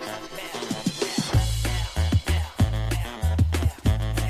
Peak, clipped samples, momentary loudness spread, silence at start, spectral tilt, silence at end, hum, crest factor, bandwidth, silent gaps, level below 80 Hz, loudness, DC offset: -10 dBFS; under 0.1%; 8 LU; 0 s; -5 dB/octave; 0 s; none; 14 dB; 15.5 kHz; none; -28 dBFS; -26 LUFS; under 0.1%